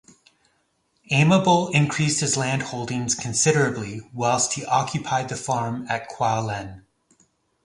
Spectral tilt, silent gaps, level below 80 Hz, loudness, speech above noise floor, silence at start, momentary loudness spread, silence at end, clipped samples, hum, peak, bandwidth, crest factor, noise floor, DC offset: -4 dB/octave; none; -56 dBFS; -22 LUFS; 46 dB; 1.1 s; 10 LU; 0.85 s; under 0.1%; none; -4 dBFS; 11.5 kHz; 20 dB; -69 dBFS; under 0.1%